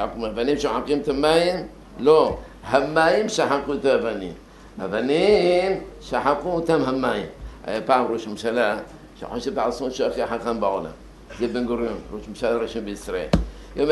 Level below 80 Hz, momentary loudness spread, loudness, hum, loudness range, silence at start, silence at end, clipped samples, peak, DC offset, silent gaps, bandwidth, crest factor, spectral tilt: -42 dBFS; 16 LU; -22 LUFS; none; 6 LU; 0 s; 0 s; under 0.1%; -2 dBFS; under 0.1%; none; 12 kHz; 20 dB; -5 dB/octave